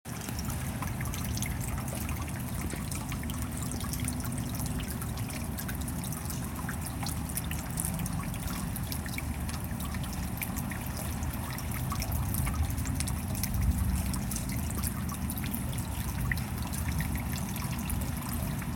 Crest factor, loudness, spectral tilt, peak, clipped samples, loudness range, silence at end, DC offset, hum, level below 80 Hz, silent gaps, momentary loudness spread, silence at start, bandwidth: 22 dB; -34 LUFS; -4.5 dB/octave; -12 dBFS; under 0.1%; 3 LU; 0 s; under 0.1%; none; -38 dBFS; none; 4 LU; 0.05 s; 17 kHz